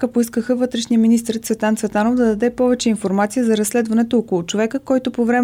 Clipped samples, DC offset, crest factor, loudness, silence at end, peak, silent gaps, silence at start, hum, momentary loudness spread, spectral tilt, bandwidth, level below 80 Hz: under 0.1%; under 0.1%; 12 dB; -18 LUFS; 0 s; -6 dBFS; none; 0 s; none; 4 LU; -5 dB/octave; 16 kHz; -52 dBFS